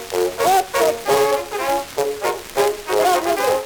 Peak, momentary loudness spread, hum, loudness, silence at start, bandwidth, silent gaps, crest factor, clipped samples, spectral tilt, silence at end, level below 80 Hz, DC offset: -4 dBFS; 5 LU; none; -19 LUFS; 0 s; over 20 kHz; none; 14 dB; under 0.1%; -2.5 dB/octave; 0 s; -50 dBFS; under 0.1%